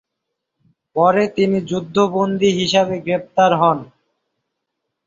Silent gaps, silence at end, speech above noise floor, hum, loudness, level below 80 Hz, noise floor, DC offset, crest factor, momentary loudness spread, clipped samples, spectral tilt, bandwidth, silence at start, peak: none; 1.2 s; 62 dB; none; -17 LUFS; -58 dBFS; -78 dBFS; under 0.1%; 16 dB; 7 LU; under 0.1%; -5.5 dB/octave; 7.6 kHz; 0.95 s; -2 dBFS